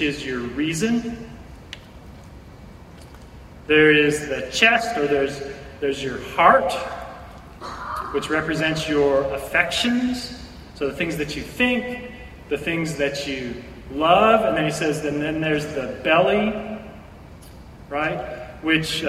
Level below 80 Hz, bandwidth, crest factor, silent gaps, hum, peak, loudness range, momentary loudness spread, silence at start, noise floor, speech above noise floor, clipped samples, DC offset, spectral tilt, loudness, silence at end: -46 dBFS; 15.5 kHz; 22 dB; none; none; 0 dBFS; 5 LU; 20 LU; 0 s; -42 dBFS; 21 dB; under 0.1%; under 0.1%; -4.5 dB/octave; -21 LUFS; 0 s